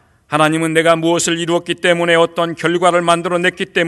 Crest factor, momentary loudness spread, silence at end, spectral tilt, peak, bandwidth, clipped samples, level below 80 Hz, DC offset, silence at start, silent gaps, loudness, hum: 14 dB; 5 LU; 0 s; -4 dB/octave; 0 dBFS; 12.5 kHz; under 0.1%; -58 dBFS; under 0.1%; 0.3 s; none; -14 LUFS; none